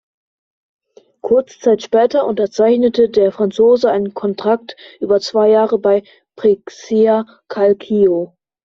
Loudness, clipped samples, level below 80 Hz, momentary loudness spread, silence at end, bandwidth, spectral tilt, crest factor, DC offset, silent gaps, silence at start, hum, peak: -15 LUFS; under 0.1%; -58 dBFS; 8 LU; 0.4 s; 7.4 kHz; -6 dB/octave; 14 dB; under 0.1%; none; 1.25 s; none; -2 dBFS